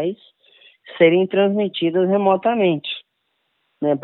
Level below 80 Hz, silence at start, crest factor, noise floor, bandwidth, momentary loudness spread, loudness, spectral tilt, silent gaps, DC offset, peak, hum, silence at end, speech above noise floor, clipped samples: -74 dBFS; 0 s; 18 dB; -71 dBFS; 4.2 kHz; 15 LU; -18 LUFS; -10.5 dB/octave; none; under 0.1%; -2 dBFS; none; 0.05 s; 54 dB; under 0.1%